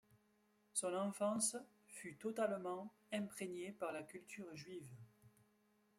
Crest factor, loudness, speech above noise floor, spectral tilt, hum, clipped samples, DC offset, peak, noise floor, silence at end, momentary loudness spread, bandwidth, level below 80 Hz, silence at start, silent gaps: 20 dB; -45 LUFS; 33 dB; -3.5 dB/octave; none; under 0.1%; under 0.1%; -26 dBFS; -77 dBFS; 0.7 s; 14 LU; 16 kHz; -88 dBFS; 0.75 s; none